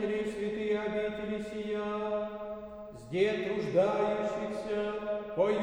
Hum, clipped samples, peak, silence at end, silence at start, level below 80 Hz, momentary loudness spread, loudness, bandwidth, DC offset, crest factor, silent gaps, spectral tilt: none; under 0.1%; -14 dBFS; 0 s; 0 s; -60 dBFS; 10 LU; -33 LUFS; 10.5 kHz; under 0.1%; 18 dB; none; -6.5 dB/octave